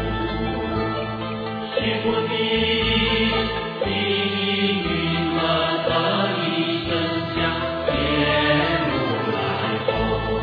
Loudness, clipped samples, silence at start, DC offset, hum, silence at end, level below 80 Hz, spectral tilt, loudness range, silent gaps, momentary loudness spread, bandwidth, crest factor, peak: -21 LUFS; under 0.1%; 0 s; under 0.1%; none; 0 s; -38 dBFS; -8 dB/octave; 1 LU; none; 6 LU; 5.2 kHz; 16 dB; -6 dBFS